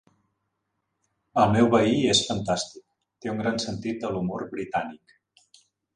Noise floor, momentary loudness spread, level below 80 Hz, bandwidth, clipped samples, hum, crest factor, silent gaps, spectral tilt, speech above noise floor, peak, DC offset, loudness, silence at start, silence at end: -79 dBFS; 13 LU; -56 dBFS; 11 kHz; under 0.1%; none; 20 dB; none; -4.5 dB/octave; 54 dB; -6 dBFS; under 0.1%; -25 LUFS; 1.35 s; 1 s